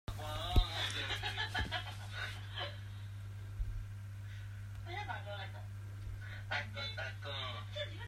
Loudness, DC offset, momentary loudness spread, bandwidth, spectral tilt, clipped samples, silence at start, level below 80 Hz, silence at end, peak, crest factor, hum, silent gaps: -41 LUFS; under 0.1%; 11 LU; 16 kHz; -4 dB/octave; under 0.1%; 0.1 s; -46 dBFS; 0 s; -16 dBFS; 24 dB; 50 Hz at -45 dBFS; none